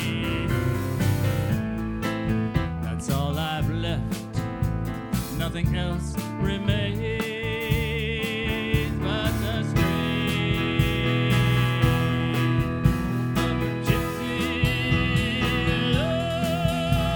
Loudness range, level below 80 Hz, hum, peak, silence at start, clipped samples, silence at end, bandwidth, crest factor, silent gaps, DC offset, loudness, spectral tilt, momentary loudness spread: 4 LU; -36 dBFS; none; -6 dBFS; 0 s; under 0.1%; 0 s; 19 kHz; 18 dB; none; under 0.1%; -25 LUFS; -6 dB/octave; 6 LU